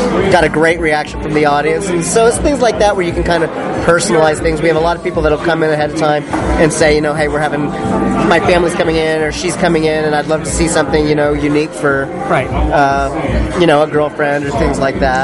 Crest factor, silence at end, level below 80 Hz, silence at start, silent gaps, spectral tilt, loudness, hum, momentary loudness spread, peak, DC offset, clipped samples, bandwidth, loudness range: 12 dB; 0 s; -26 dBFS; 0 s; none; -5 dB/octave; -13 LUFS; none; 5 LU; 0 dBFS; under 0.1%; under 0.1%; 11.5 kHz; 1 LU